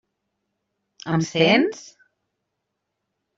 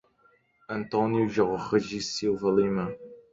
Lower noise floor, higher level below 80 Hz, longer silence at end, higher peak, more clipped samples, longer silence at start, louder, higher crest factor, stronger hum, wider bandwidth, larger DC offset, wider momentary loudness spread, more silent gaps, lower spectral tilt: first, -79 dBFS vs -65 dBFS; about the same, -64 dBFS vs -60 dBFS; first, 1.55 s vs 0.15 s; first, -2 dBFS vs -10 dBFS; neither; first, 1.05 s vs 0.7 s; first, -20 LUFS vs -27 LUFS; about the same, 22 dB vs 18 dB; neither; about the same, 7.8 kHz vs 7.8 kHz; neither; first, 21 LU vs 11 LU; neither; about the same, -5 dB/octave vs -5.5 dB/octave